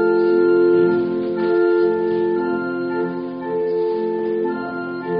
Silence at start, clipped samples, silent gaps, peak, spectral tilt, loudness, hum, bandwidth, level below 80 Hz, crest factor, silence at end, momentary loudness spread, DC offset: 0 s; under 0.1%; none; -6 dBFS; -6.5 dB/octave; -19 LUFS; none; 5 kHz; -60 dBFS; 12 dB; 0 s; 10 LU; under 0.1%